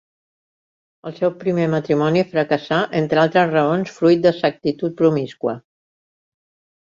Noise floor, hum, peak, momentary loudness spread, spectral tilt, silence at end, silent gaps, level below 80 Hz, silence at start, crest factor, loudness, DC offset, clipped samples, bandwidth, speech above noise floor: under -90 dBFS; none; -2 dBFS; 10 LU; -7.5 dB/octave; 1.35 s; none; -60 dBFS; 1.05 s; 16 dB; -18 LUFS; under 0.1%; under 0.1%; 7.6 kHz; over 72 dB